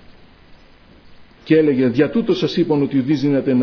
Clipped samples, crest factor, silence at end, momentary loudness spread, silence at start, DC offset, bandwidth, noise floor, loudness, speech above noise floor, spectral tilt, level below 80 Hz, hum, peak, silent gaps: under 0.1%; 16 dB; 0 s; 3 LU; 0.1 s; under 0.1%; 5.4 kHz; -46 dBFS; -17 LUFS; 31 dB; -8 dB/octave; -52 dBFS; none; -2 dBFS; none